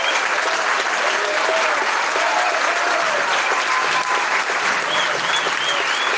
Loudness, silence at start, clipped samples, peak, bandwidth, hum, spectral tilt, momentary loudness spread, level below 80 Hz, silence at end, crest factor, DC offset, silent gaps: -18 LUFS; 0 s; under 0.1%; -6 dBFS; 10.5 kHz; none; 0 dB/octave; 1 LU; -68 dBFS; 0 s; 14 dB; under 0.1%; none